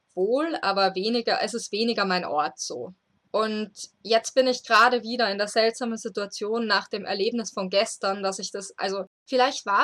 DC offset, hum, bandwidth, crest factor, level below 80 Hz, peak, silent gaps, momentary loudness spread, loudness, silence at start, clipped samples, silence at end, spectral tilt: under 0.1%; none; 13.5 kHz; 18 dB; -80 dBFS; -8 dBFS; 9.07-9.26 s; 11 LU; -25 LUFS; 0.15 s; under 0.1%; 0 s; -3 dB/octave